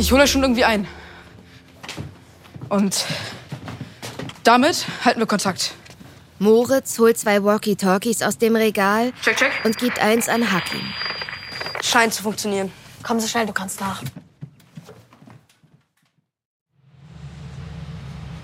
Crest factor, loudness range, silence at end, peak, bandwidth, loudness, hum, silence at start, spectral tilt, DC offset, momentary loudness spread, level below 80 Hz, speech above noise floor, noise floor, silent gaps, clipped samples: 20 dB; 9 LU; 0 s; -2 dBFS; 16.5 kHz; -19 LUFS; none; 0 s; -3.5 dB/octave; under 0.1%; 19 LU; -44 dBFS; 48 dB; -67 dBFS; 16.45-16.66 s; under 0.1%